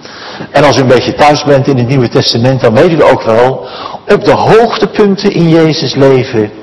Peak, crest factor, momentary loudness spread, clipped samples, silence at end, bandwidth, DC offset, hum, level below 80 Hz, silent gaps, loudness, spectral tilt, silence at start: 0 dBFS; 8 dB; 7 LU; 7%; 0 s; 12 kHz; under 0.1%; none; -38 dBFS; none; -7 LUFS; -6 dB/octave; 0.05 s